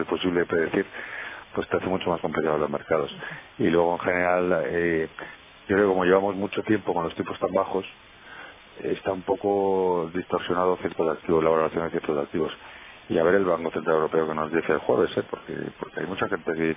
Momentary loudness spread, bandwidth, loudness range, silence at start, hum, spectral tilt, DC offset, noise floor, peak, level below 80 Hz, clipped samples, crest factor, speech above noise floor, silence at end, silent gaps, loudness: 13 LU; 3.8 kHz; 3 LU; 0 s; none; -10 dB/octave; under 0.1%; -44 dBFS; -6 dBFS; -54 dBFS; under 0.1%; 18 dB; 20 dB; 0 s; none; -25 LUFS